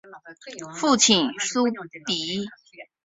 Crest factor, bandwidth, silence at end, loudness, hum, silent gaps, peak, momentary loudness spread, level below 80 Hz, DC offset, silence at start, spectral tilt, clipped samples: 24 dB; 8.2 kHz; 0.2 s; -22 LUFS; none; none; -2 dBFS; 21 LU; -66 dBFS; under 0.1%; 0.05 s; -2 dB/octave; under 0.1%